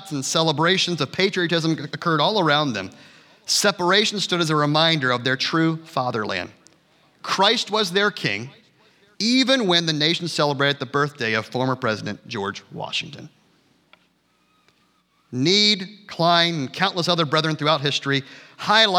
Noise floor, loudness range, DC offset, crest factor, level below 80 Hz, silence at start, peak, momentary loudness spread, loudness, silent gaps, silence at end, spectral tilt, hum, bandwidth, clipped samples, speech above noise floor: -64 dBFS; 7 LU; under 0.1%; 20 dB; -74 dBFS; 0 s; -2 dBFS; 11 LU; -20 LUFS; none; 0 s; -3.5 dB/octave; none; 17.5 kHz; under 0.1%; 43 dB